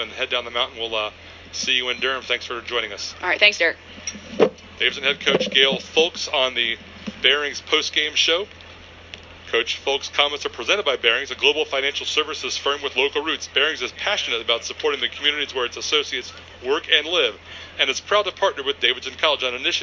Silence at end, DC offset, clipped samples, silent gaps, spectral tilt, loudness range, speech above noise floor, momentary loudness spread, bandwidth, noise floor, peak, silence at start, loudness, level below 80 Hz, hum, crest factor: 0 s; under 0.1%; under 0.1%; none; -1.5 dB/octave; 3 LU; 20 dB; 11 LU; 7.6 kHz; -43 dBFS; 0 dBFS; 0 s; -20 LUFS; -52 dBFS; none; 22 dB